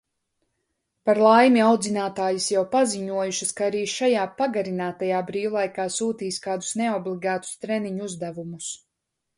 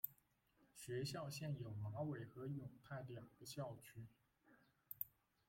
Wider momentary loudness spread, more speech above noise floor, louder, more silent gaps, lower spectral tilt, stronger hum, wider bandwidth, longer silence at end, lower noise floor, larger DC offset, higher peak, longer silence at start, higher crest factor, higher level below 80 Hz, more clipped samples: first, 14 LU vs 11 LU; first, 58 dB vs 29 dB; first, -23 LUFS vs -51 LUFS; neither; second, -4 dB/octave vs -5.5 dB/octave; neither; second, 11.5 kHz vs 16.5 kHz; first, 0.6 s vs 0.4 s; about the same, -81 dBFS vs -79 dBFS; neither; first, -4 dBFS vs -28 dBFS; first, 1.05 s vs 0.05 s; about the same, 20 dB vs 24 dB; first, -70 dBFS vs -78 dBFS; neither